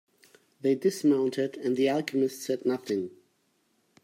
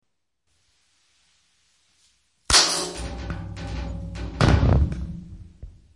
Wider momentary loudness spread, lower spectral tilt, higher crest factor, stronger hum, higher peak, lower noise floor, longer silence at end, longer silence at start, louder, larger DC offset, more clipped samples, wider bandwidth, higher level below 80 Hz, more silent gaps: second, 7 LU vs 20 LU; first, -5.5 dB/octave vs -3.5 dB/octave; about the same, 16 dB vs 20 dB; neither; second, -14 dBFS vs -6 dBFS; second, -71 dBFS vs -76 dBFS; first, 0.95 s vs 0.25 s; second, 0.65 s vs 2.5 s; second, -28 LUFS vs -22 LUFS; neither; neither; first, 16 kHz vs 11.5 kHz; second, -80 dBFS vs -32 dBFS; neither